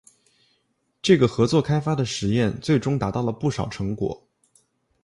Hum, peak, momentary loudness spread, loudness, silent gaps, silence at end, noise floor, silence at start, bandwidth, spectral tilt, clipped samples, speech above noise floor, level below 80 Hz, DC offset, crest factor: none; -4 dBFS; 10 LU; -23 LUFS; none; 0.85 s; -70 dBFS; 1.05 s; 11.5 kHz; -6.5 dB/octave; under 0.1%; 49 dB; -48 dBFS; under 0.1%; 20 dB